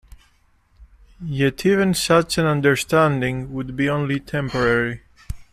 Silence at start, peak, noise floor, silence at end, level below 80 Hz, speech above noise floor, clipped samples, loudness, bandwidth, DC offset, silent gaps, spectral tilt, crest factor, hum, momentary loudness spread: 0.8 s; -4 dBFS; -59 dBFS; 0.1 s; -44 dBFS; 39 dB; under 0.1%; -20 LUFS; 15 kHz; under 0.1%; none; -5.5 dB/octave; 18 dB; none; 12 LU